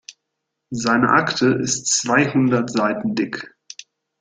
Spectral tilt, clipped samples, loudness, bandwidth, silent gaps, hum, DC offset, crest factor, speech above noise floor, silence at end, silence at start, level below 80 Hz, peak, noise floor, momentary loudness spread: -4 dB/octave; under 0.1%; -18 LUFS; 9.6 kHz; none; none; under 0.1%; 18 dB; 60 dB; 0.75 s; 0.1 s; -58 dBFS; -2 dBFS; -79 dBFS; 19 LU